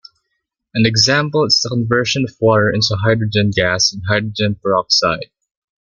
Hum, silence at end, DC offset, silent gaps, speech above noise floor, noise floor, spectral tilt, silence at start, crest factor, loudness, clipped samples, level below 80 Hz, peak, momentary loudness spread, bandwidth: none; 0.55 s; under 0.1%; none; 58 dB; -74 dBFS; -4 dB/octave; 0.75 s; 16 dB; -15 LUFS; under 0.1%; -48 dBFS; 0 dBFS; 6 LU; 7.4 kHz